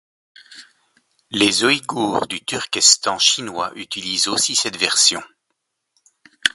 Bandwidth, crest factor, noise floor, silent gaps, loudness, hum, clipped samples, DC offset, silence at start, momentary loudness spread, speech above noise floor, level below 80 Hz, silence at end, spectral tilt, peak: 16 kHz; 20 dB; -75 dBFS; none; -17 LUFS; none; under 0.1%; under 0.1%; 0.5 s; 13 LU; 56 dB; -62 dBFS; 0.05 s; -0.5 dB/octave; 0 dBFS